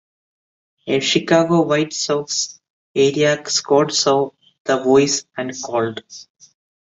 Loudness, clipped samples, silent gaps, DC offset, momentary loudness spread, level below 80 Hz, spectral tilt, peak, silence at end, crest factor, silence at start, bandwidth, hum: -18 LUFS; under 0.1%; 2.70-2.94 s, 4.60-4.65 s; under 0.1%; 12 LU; -62 dBFS; -3.5 dB/octave; -2 dBFS; 0.65 s; 18 dB; 0.85 s; 8 kHz; none